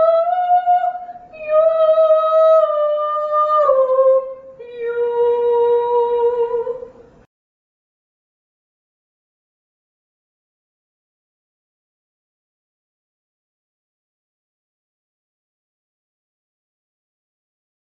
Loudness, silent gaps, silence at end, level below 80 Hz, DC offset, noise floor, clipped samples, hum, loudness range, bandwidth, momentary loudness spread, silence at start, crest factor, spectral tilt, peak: -16 LUFS; none; 11.1 s; -64 dBFS; under 0.1%; -38 dBFS; under 0.1%; none; 9 LU; 4.7 kHz; 16 LU; 0 s; 18 dB; -5 dB/octave; -2 dBFS